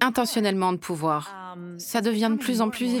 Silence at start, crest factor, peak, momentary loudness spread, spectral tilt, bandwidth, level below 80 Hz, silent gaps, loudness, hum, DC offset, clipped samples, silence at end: 0 s; 22 dB; -4 dBFS; 14 LU; -4.5 dB/octave; over 20 kHz; -66 dBFS; none; -25 LUFS; none; under 0.1%; under 0.1%; 0 s